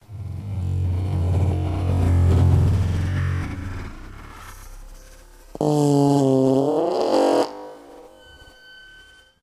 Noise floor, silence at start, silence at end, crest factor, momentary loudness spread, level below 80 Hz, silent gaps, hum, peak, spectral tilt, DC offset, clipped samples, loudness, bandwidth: -49 dBFS; 0.1 s; 1.35 s; 16 dB; 21 LU; -36 dBFS; none; none; -6 dBFS; -8 dB/octave; under 0.1%; under 0.1%; -21 LUFS; 12.5 kHz